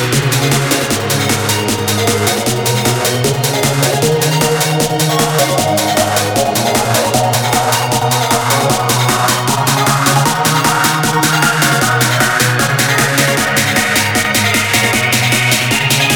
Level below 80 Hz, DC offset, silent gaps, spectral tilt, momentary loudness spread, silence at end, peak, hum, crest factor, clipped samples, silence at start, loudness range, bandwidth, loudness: -40 dBFS; under 0.1%; none; -3.5 dB/octave; 3 LU; 0 s; 0 dBFS; none; 12 dB; under 0.1%; 0 s; 2 LU; over 20 kHz; -12 LUFS